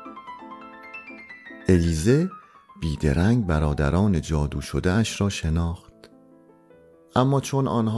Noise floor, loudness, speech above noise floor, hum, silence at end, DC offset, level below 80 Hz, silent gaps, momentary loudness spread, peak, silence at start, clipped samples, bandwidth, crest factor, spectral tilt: -53 dBFS; -23 LUFS; 31 dB; none; 0 s; under 0.1%; -38 dBFS; none; 19 LU; -6 dBFS; 0 s; under 0.1%; 12 kHz; 18 dB; -6.5 dB/octave